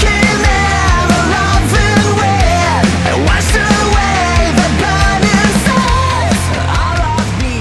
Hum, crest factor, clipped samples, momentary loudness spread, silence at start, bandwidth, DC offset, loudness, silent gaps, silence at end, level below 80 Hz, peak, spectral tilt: none; 10 dB; under 0.1%; 4 LU; 0 s; 12 kHz; under 0.1%; -11 LUFS; none; 0 s; -18 dBFS; 0 dBFS; -4.5 dB/octave